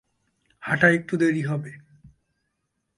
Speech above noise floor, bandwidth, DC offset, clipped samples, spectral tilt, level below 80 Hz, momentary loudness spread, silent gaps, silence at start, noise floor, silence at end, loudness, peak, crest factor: 55 dB; 11.5 kHz; under 0.1%; under 0.1%; -7 dB/octave; -64 dBFS; 17 LU; none; 0.6 s; -77 dBFS; 0.9 s; -22 LUFS; -4 dBFS; 22 dB